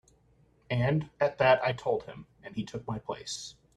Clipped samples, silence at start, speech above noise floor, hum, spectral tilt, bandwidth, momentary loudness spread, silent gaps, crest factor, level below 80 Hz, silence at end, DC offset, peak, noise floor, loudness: under 0.1%; 0.7 s; 35 dB; none; -5.5 dB/octave; 12 kHz; 15 LU; none; 22 dB; -60 dBFS; 0.25 s; under 0.1%; -10 dBFS; -65 dBFS; -30 LUFS